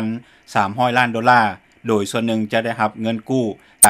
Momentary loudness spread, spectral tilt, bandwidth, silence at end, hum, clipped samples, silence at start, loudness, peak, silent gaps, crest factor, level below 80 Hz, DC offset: 11 LU; -3 dB/octave; 15.5 kHz; 0 s; none; under 0.1%; 0 s; -19 LUFS; 0 dBFS; none; 18 dB; -64 dBFS; under 0.1%